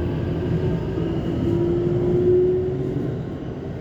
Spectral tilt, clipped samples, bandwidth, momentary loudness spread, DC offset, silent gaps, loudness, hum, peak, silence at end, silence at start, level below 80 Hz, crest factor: -10 dB/octave; under 0.1%; 7.2 kHz; 10 LU; under 0.1%; none; -22 LUFS; none; -8 dBFS; 0 s; 0 s; -38 dBFS; 14 dB